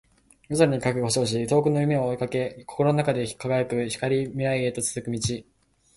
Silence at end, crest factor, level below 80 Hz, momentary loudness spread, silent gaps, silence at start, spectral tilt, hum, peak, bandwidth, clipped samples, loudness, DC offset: 0.55 s; 20 dB; -54 dBFS; 7 LU; none; 0.5 s; -5.5 dB/octave; none; -6 dBFS; 11.5 kHz; under 0.1%; -25 LUFS; under 0.1%